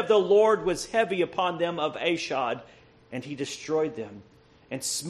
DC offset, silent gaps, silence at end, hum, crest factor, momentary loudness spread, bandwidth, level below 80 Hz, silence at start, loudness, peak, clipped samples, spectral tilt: under 0.1%; none; 0 s; none; 16 dB; 18 LU; 13 kHz; -62 dBFS; 0 s; -26 LUFS; -10 dBFS; under 0.1%; -3.5 dB/octave